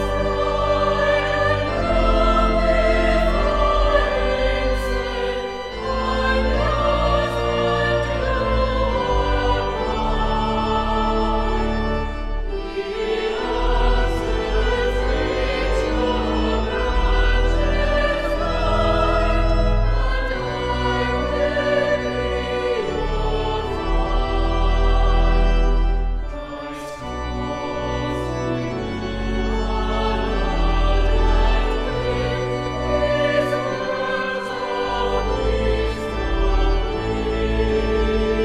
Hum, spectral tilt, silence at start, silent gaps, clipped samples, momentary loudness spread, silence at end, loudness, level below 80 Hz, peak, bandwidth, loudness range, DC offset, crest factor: none; -6 dB/octave; 0 s; none; under 0.1%; 6 LU; 0 s; -21 LUFS; -22 dBFS; -4 dBFS; 8.4 kHz; 4 LU; under 0.1%; 14 dB